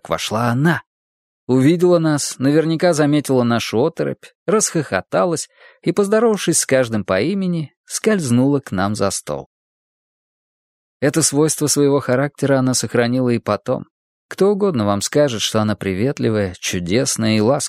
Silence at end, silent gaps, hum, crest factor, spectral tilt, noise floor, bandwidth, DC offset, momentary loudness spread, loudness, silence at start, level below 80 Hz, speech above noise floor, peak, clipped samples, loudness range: 0 s; 0.87-1.47 s, 4.35-4.46 s, 7.77-7.84 s, 9.46-11.00 s, 13.90-14.29 s; none; 18 dB; -4.5 dB/octave; under -90 dBFS; 16 kHz; under 0.1%; 8 LU; -17 LUFS; 0.05 s; -56 dBFS; over 73 dB; 0 dBFS; under 0.1%; 4 LU